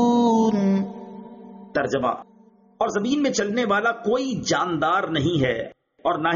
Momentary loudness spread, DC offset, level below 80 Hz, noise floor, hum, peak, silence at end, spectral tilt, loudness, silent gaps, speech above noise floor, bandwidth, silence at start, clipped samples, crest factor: 16 LU; under 0.1%; -56 dBFS; -42 dBFS; none; -8 dBFS; 0 s; -4.5 dB/octave; -22 LUFS; none; 19 dB; 7.2 kHz; 0 s; under 0.1%; 14 dB